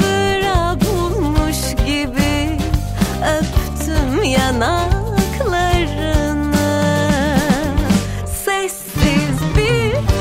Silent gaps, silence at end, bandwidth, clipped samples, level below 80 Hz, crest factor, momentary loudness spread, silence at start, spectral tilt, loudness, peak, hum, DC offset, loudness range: none; 0 s; 16.5 kHz; under 0.1%; -22 dBFS; 12 dB; 4 LU; 0 s; -5 dB/octave; -17 LUFS; -4 dBFS; none; under 0.1%; 1 LU